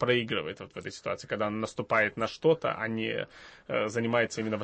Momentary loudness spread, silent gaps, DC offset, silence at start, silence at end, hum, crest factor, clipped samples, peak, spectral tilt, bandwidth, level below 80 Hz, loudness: 12 LU; none; under 0.1%; 0 s; 0 s; none; 18 dB; under 0.1%; -12 dBFS; -5 dB/octave; 8.8 kHz; -66 dBFS; -30 LUFS